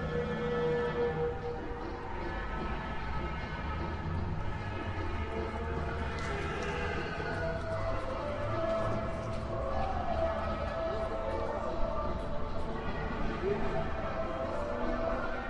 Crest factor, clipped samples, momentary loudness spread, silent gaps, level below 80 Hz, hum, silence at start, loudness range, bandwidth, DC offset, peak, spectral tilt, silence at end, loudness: 14 dB; under 0.1%; 5 LU; none; -42 dBFS; none; 0 s; 3 LU; 9.8 kHz; under 0.1%; -20 dBFS; -7 dB/octave; 0 s; -35 LUFS